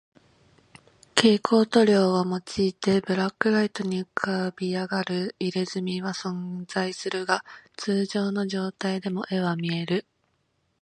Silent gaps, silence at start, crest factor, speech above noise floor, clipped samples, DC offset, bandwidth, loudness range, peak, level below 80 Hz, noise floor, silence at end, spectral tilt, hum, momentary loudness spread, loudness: none; 1.15 s; 26 dB; 47 dB; under 0.1%; under 0.1%; 11 kHz; 6 LU; 0 dBFS; -66 dBFS; -72 dBFS; 0.8 s; -5.5 dB/octave; none; 10 LU; -25 LUFS